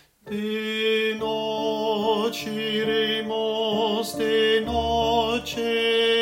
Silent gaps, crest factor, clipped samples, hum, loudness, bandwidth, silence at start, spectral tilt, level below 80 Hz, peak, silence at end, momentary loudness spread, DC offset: none; 14 dB; under 0.1%; none; -24 LUFS; 16.5 kHz; 0.25 s; -4 dB/octave; -48 dBFS; -10 dBFS; 0 s; 6 LU; under 0.1%